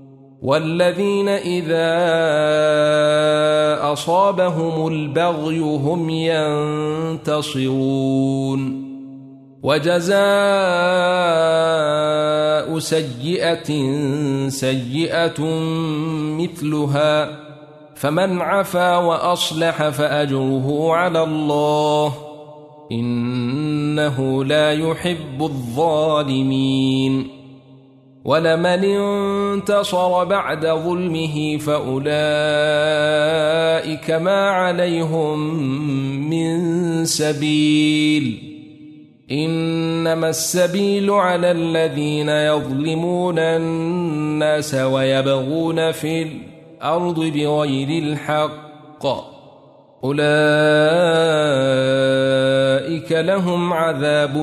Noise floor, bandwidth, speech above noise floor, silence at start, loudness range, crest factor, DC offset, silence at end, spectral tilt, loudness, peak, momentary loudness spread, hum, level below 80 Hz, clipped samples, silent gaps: -47 dBFS; 13.5 kHz; 29 dB; 0 s; 4 LU; 16 dB; under 0.1%; 0 s; -5.5 dB/octave; -18 LUFS; -2 dBFS; 7 LU; none; -58 dBFS; under 0.1%; none